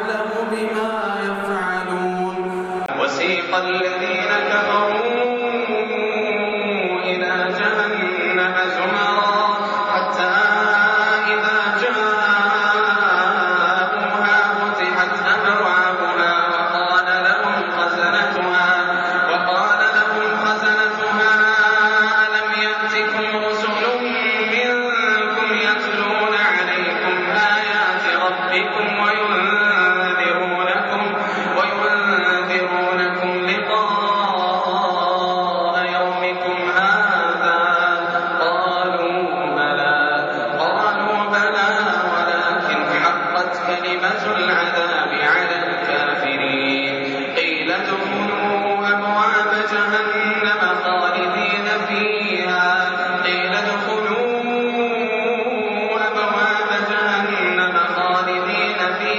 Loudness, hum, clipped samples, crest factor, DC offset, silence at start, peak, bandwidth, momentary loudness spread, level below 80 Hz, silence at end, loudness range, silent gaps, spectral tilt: -17 LUFS; none; under 0.1%; 12 dB; under 0.1%; 0 s; -6 dBFS; 8 kHz; 5 LU; -66 dBFS; 0 s; 3 LU; none; -0.5 dB/octave